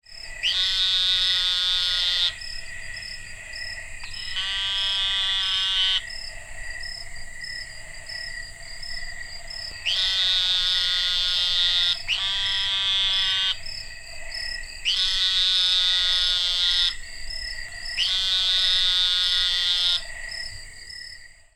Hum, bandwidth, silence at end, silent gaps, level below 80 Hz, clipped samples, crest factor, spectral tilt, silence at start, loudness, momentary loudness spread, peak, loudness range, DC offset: none; 16.5 kHz; 0.25 s; none; -42 dBFS; under 0.1%; 18 dB; 1.5 dB/octave; 0.1 s; -21 LUFS; 17 LU; -8 dBFS; 6 LU; under 0.1%